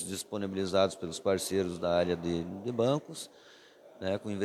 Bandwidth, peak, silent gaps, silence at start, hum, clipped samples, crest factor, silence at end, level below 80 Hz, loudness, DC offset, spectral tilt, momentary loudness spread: 14.5 kHz; -14 dBFS; none; 0 s; none; under 0.1%; 18 dB; 0 s; -64 dBFS; -32 LUFS; under 0.1%; -5 dB/octave; 8 LU